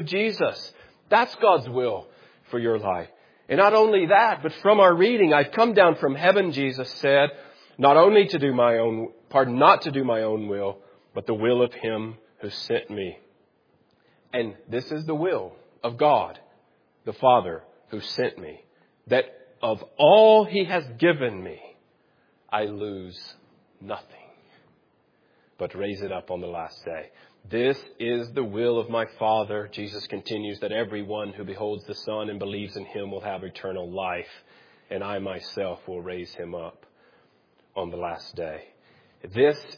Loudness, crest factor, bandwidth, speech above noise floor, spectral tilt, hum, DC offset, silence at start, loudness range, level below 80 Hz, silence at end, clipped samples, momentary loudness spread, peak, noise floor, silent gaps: -23 LUFS; 22 dB; 5.2 kHz; 42 dB; -6.5 dB/octave; none; under 0.1%; 0 s; 16 LU; -68 dBFS; 0.05 s; under 0.1%; 19 LU; -2 dBFS; -65 dBFS; none